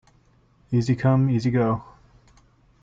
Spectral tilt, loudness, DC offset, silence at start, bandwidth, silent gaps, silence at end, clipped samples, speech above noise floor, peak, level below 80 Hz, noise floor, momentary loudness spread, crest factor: -8.5 dB/octave; -22 LUFS; under 0.1%; 0.7 s; 7.6 kHz; none; 1 s; under 0.1%; 38 dB; -10 dBFS; -54 dBFS; -59 dBFS; 6 LU; 14 dB